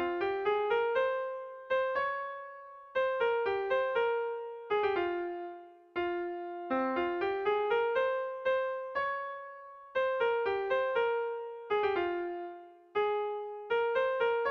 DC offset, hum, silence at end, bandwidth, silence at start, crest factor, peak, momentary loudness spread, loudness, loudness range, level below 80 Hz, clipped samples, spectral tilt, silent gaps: under 0.1%; none; 0 s; 6.4 kHz; 0 s; 14 dB; -20 dBFS; 11 LU; -32 LUFS; 1 LU; -70 dBFS; under 0.1%; -5.5 dB/octave; none